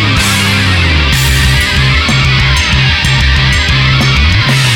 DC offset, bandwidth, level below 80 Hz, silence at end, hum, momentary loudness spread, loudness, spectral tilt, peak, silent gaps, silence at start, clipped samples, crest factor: under 0.1%; 18.5 kHz; -16 dBFS; 0 s; none; 1 LU; -8 LUFS; -4 dB/octave; 0 dBFS; none; 0 s; under 0.1%; 8 dB